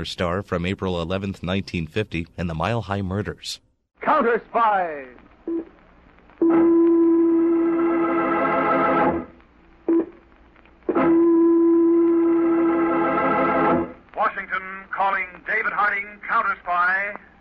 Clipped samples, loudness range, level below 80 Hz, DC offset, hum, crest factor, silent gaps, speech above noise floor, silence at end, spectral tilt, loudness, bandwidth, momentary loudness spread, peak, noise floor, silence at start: under 0.1%; 6 LU; -50 dBFS; under 0.1%; none; 14 dB; none; 29 dB; 0.25 s; -7 dB/octave; -21 LUFS; 8.4 kHz; 13 LU; -8 dBFS; -52 dBFS; 0 s